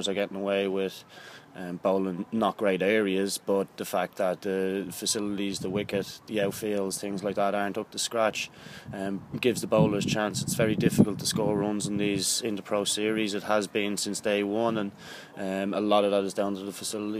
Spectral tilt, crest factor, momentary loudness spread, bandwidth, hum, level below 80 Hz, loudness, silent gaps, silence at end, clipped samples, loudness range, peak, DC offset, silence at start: -4.5 dB/octave; 22 dB; 10 LU; 15.5 kHz; none; -62 dBFS; -28 LUFS; none; 0 s; under 0.1%; 4 LU; -6 dBFS; under 0.1%; 0 s